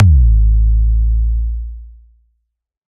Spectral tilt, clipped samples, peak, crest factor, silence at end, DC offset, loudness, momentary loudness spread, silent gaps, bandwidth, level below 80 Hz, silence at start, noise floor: -12.5 dB/octave; under 0.1%; 0 dBFS; 12 dB; 1.05 s; under 0.1%; -15 LUFS; 17 LU; none; 0.5 kHz; -14 dBFS; 0 s; -71 dBFS